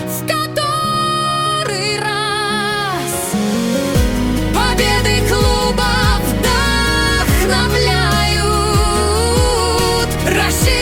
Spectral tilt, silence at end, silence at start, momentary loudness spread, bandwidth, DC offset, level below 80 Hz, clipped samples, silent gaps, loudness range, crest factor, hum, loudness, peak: -4 dB/octave; 0 s; 0 s; 4 LU; 18 kHz; under 0.1%; -22 dBFS; under 0.1%; none; 3 LU; 14 dB; none; -15 LUFS; -2 dBFS